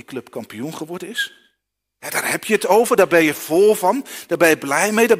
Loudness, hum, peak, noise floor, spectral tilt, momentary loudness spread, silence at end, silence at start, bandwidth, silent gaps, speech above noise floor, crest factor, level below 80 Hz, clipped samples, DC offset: -17 LUFS; none; 0 dBFS; -76 dBFS; -3.5 dB/octave; 16 LU; 0 s; 0.1 s; 16 kHz; none; 58 dB; 18 dB; -62 dBFS; under 0.1%; under 0.1%